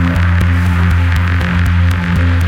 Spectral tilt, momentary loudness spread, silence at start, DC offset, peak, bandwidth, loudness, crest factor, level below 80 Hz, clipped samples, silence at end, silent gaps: -7 dB/octave; 1 LU; 0 s; under 0.1%; 0 dBFS; 9.2 kHz; -13 LUFS; 12 dB; -20 dBFS; under 0.1%; 0 s; none